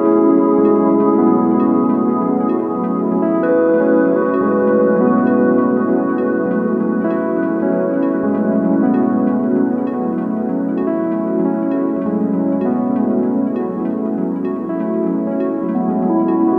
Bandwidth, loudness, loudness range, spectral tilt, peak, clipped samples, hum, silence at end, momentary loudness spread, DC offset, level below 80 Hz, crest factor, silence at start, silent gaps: 3.5 kHz; -16 LUFS; 4 LU; -11.5 dB/octave; -2 dBFS; under 0.1%; none; 0 s; 6 LU; under 0.1%; -60 dBFS; 14 dB; 0 s; none